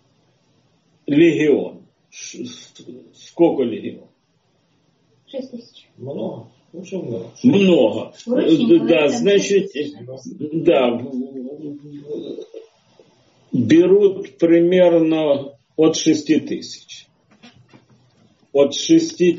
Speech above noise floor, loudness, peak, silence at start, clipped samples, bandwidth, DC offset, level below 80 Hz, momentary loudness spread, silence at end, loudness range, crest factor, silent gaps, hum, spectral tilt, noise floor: 46 dB; -17 LUFS; -2 dBFS; 1.1 s; under 0.1%; 7.6 kHz; under 0.1%; -64 dBFS; 21 LU; 0 s; 9 LU; 16 dB; none; none; -5.5 dB/octave; -63 dBFS